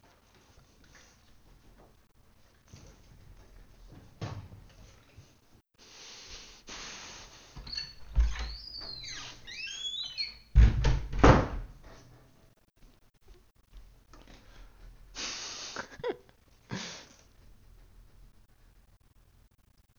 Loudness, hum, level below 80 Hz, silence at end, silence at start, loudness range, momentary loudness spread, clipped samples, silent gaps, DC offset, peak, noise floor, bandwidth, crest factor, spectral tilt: -32 LUFS; none; -36 dBFS; 2.95 s; 2.75 s; 22 LU; 30 LU; under 0.1%; none; under 0.1%; -6 dBFS; -65 dBFS; 7.2 kHz; 28 dB; -5 dB/octave